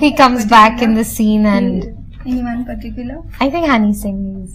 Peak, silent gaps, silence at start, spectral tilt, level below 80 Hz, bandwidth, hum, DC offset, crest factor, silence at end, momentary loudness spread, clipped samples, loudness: 0 dBFS; none; 0 s; -5 dB/octave; -32 dBFS; 16 kHz; none; under 0.1%; 14 dB; 0 s; 18 LU; 0.3%; -13 LUFS